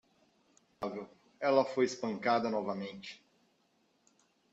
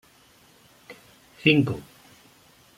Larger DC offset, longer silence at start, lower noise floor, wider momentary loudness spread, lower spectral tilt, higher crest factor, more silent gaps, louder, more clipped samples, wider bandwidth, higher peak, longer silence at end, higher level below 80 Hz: neither; about the same, 0.8 s vs 0.9 s; first, -74 dBFS vs -57 dBFS; second, 19 LU vs 27 LU; second, -5 dB/octave vs -6.5 dB/octave; about the same, 22 dB vs 24 dB; neither; second, -34 LUFS vs -23 LUFS; neither; second, 8 kHz vs 16 kHz; second, -14 dBFS vs -6 dBFS; first, 1.35 s vs 0.95 s; second, -78 dBFS vs -62 dBFS